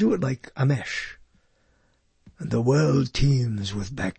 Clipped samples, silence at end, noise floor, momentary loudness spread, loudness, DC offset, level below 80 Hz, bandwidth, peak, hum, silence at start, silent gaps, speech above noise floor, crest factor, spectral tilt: under 0.1%; 0.05 s; -65 dBFS; 10 LU; -24 LUFS; under 0.1%; -40 dBFS; 8.6 kHz; -10 dBFS; none; 0 s; none; 42 dB; 16 dB; -6.5 dB/octave